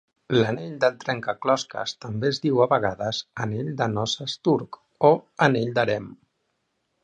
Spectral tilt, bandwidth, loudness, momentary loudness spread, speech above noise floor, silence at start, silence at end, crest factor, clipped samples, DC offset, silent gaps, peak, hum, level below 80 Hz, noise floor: -5.5 dB/octave; 9.4 kHz; -24 LUFS; 10 LU; 51 dB; 0.3 s; 0.9 s; 22 dB; under 0.1%; under 0.1%; none; -2 dBFS; none; -60 dBFS; -75 dBFS